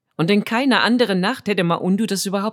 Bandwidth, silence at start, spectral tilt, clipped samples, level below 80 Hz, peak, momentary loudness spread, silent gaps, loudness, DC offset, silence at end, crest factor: 17 kHz; 0.2 s; -5 dB/octave; under 0.1%; -70 dBFS; -2 dBFS; 5 LU; none; -18 LUFS; under 0.1%; 0 s; 18 dB